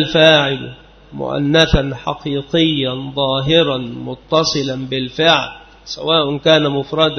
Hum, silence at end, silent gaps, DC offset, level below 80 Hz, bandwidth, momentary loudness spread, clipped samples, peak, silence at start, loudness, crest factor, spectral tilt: none; 0 s; none; under 0.1%; -34 dBFS; 6.6 kHz; 14 LU; under 0.1%; 0 dBFS; 0 s; -15 LUFS; 16 dB; -5 dB/octave